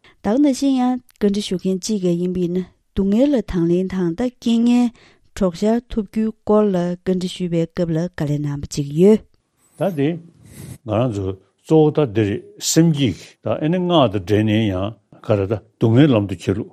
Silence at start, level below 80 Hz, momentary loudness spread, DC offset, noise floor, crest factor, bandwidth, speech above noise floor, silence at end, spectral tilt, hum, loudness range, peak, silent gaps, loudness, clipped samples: 0.25 s; -44 dBFS; 9 LU; under 0.1%; -58 dBFS; 18 dB; 15 kHz; 41 dB; 0.05 s; -6.5 dB/octave; none; 3 LU; 0 dBFS; none; -19 LUFS; under 0.1%